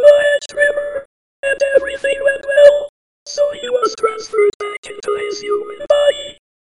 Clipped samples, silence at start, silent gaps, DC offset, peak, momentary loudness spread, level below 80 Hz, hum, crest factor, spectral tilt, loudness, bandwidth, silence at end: under 0.1%; 0 s; 1.05-1.43 s, 2.89-3.26 s, 4.54-4.60 s, 4.78-4.83 s; 0.2%; 0 dBFS; 16 LU; -52 dBFS; none; 16 dB; -1.5 dB/octave; -16 LUFS; 11 kHz; 0.3 s